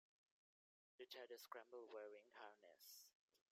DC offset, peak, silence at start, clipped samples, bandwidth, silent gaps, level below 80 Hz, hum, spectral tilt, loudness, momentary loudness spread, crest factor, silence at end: under 0.1%; -40 dBFS; 1 s; under 0.1%; 15.5 kHz; 3.15-3.28 s; under -90 dBFS; none; -0.5 dB/octave; -61 LUFS; 7 LU; 24 dB; 0.15 s